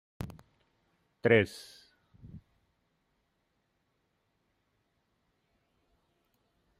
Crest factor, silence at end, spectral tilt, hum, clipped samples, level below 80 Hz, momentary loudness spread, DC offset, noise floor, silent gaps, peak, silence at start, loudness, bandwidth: 30 dB; 4.4 s; -6.5 dB/octave; none; under 0.1%; -66 dBFS; 23 LU; under 0.1%; -78 dBFS; none; -8 dBFS; 0.2 s; -28 LUFS; 15 kHz